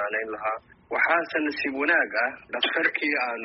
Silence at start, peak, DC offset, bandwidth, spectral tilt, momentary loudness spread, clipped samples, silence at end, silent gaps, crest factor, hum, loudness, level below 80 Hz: 0 s; -8 dBFS; under 0.1%; 5.8 kHz; 1 dB/octave; 8 LU; under 0.1%; 0 s; none; 18 dB; none; -25 LUFS; -68 dBFS